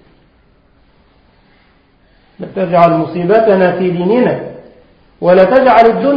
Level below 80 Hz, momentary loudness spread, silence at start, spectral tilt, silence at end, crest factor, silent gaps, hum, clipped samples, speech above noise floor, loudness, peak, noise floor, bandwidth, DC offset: -48 dBFS; 14 LU; 2.4 s; -9 dB/octave; 0 s; 12 dB; none; none; 0.2%; 41 dB; -10 LUFS; 0 dBFS; -50 dBFS; 5.4 kHz; under 0.1%